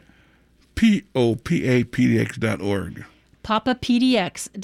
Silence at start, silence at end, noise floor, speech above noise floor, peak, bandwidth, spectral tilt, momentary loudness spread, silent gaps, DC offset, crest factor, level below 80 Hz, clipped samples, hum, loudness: 0.75 s; 0 s; -57 dBFS; 37 dB; -8 dBFS; 13 kHz; -6 dB/octave; 11 LU; none; under 0.1%; 14 dB; -48 dBFS; under 0.1%; none; -21 LUFS